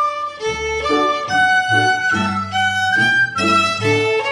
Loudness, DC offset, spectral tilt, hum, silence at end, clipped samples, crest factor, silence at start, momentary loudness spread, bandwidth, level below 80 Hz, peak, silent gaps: -16 LUFS; under 0.1%; -3.5 dB/octave; none; 0 s; under 0.1%; 14 dB; 0 s; 7 LU; 12.5 kHz; -46 dBFS; -4 dBFS; none